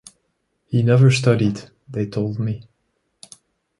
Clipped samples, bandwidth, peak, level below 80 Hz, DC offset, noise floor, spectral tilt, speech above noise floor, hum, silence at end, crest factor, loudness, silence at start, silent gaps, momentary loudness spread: under 0.1%; 11.5 kHz; -4 dBFS; -54 dBFS; under 0.1%; -71 dBFS; -7 dB/octave; 53 dB; none; 1.15 s; 18 dB; -19 LUFS; 0.7 s; none; 17 LU